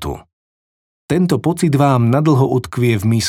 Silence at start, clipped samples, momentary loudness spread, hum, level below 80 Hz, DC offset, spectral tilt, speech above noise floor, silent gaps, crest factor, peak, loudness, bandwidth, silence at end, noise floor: 0 s; under 0.1%; 7 LU; none; -44 dBFS; under 0.1%; -6.5 dB/octave; over 76 dB; 0.33-1.08 s; 14 dB; -2 dBFS; -15 LUFS; 16 kHz; 0 s; under -90 dBFS